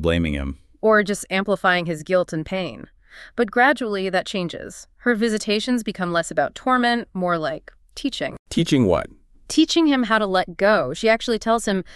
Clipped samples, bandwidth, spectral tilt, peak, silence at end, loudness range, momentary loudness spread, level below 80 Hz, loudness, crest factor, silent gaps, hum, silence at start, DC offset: under 0.1%; 13 kHz; -5 dB/octave; -4 dBFS; 0 s; 3 LU; 11 LU; -42 dBFS; -21 LUFS; 18 dB; 8.39-8.45 s; none; 0 s; under 0.1%